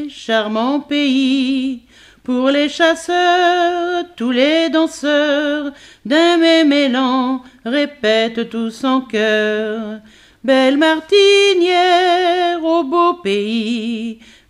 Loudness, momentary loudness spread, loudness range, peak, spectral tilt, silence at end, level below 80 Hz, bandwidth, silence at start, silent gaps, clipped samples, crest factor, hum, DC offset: -15 LUFS; 11 LU; 4 LU; 0 dBFS; -3.5 dB/octave; 0.35 s; -58 dBFS; 11.5 kHz; 0 s; none; under 0.1%; 14 dB; none; under 0.1%